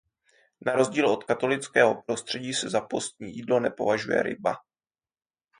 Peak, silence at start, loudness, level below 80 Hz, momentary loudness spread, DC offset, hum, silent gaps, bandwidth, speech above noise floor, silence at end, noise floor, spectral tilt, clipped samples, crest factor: -6 dBFS; 0.6 s; -26 LUFS; -68 dBFS; 10 LU; under 0.1%; none; none; 10.5 kHz; over 64 dB; 1 s; under -90 dBFS; -4 dB/octave; under 0.1%; 22 dB